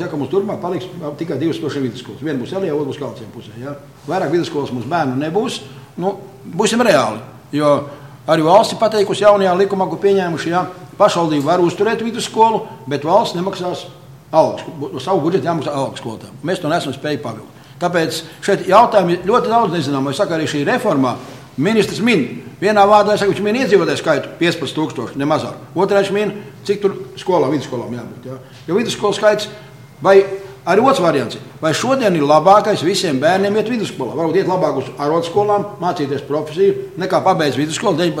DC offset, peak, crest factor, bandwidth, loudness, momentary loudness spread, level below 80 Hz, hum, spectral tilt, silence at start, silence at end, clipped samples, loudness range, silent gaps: 0.1%; 0 dBFS; 16 dB; 16 kHz; -16 LUFS; 15 LU; -58 dBFS; none; -5.5 dB/octave; 0 s; 0 s; under 0.1%; 7 LU; none